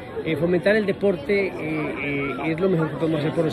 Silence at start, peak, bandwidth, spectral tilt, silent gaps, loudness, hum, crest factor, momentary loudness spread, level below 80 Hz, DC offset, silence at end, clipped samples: 0 s; -8 dBFS; 13 kHz; -7.5 dB/octave; none; -23 LUFS; none; 16 dB; 6 LU; -52 dBFS; under 0.1%; 0 s; under 0.1%